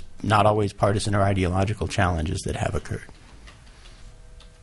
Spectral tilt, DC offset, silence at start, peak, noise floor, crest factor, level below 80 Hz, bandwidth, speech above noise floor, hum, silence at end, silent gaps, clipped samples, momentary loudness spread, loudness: -6 dB/octave; under 0.1%; 0 s; -6 dBFS; -46 dBFS; 20 dB; -40 dBFS; 11.5 kHz; 23 dB; none; 0.15 s; none; under 0.1%; 9 LU; -23 LUFS